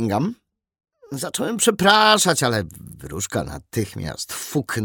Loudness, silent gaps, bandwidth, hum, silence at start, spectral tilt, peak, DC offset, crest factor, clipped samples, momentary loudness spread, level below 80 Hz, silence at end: -20 LUFS; none; 18 kHz; none; 0 s; -3.5 dB/octave; -2 dBFS; under 0.1%; 20 dB; under 0.1%; 16 LU; -50 dBFS; 0 s